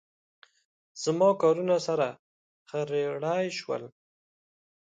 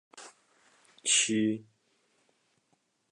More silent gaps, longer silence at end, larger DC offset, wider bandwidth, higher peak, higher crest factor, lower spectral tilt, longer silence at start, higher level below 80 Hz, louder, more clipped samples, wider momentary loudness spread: first, 2.19-2.66 s vs none; second, 1 s vs 1.5 s; neither; second, 9.2 kHz vs 11 kHz; about the same, -12 dBFS vs -12 dBFS; about the same, 18 dB vs 22 dB; first, -5 dB/octave vs -1.5 dB/octave; first, 0.95 s vs 0.15 s; about the same, -80 dBFS vs -82 dBFS; about the same, -28 LUFS vs -28 LUFS; neither; second, 13 LU vs 26 LU